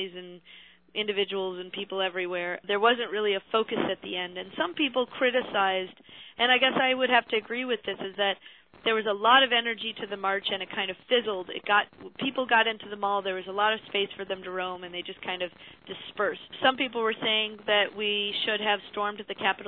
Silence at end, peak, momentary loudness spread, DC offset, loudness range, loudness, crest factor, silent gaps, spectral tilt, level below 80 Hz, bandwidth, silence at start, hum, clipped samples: 0 s; -8 dBFS; 11 LU; under 0.1%; 5 LU; -27 LUFS; 20 dB; none; -6.5 dB/octave; -72 dBFS; 4.5 kHz; 0 s; none; under 0.1%